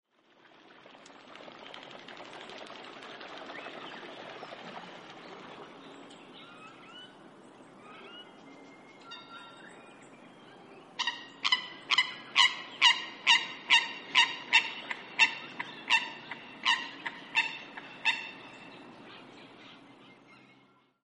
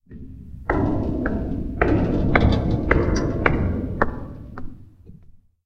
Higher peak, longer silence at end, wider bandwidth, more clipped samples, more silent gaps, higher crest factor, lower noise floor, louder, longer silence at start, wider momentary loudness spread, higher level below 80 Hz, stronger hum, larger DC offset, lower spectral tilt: second, -8 dBFS vs 0 dBFS; first, 1.3 s vs 0.3 s; first, 11.5 kHz vs 6.8 kHz; neither; neither; first, 28 dB vs 22 dB; first, -64 dBFS vs -48 dBFS; second, -27 LUFS vs -22 LUFS; first, 1.25 s vs 0.1 s; first, 25 LU vs 20 LU; second, -84 dBFS vs -28 dBFS; neither; neither; second, 0 dB/octave vs -7.5 dB/octave